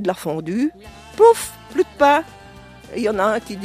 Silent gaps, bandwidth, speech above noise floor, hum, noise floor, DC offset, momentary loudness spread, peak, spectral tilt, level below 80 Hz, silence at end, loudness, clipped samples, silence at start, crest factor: none; 15.5 kHz; 23 dB; none; -41 dBFS; under 0.1%; 13 LU; -2 dBFS; -4.5 dB/octave; -50 dBFS; 0 s; -18 LUFS; under 0.1%; 0 s; 18 dB